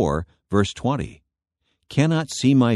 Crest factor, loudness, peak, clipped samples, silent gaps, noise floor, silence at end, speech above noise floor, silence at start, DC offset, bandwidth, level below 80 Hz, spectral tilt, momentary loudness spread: 18 dB; -22 LUFS; -4 dBFS; under 0.1%; none; -74 dBFS; 0 s; 54 dB; 0 s; under 0.1%; 12 kHz; -44 dBFS; -6 dB/octave; 9 LU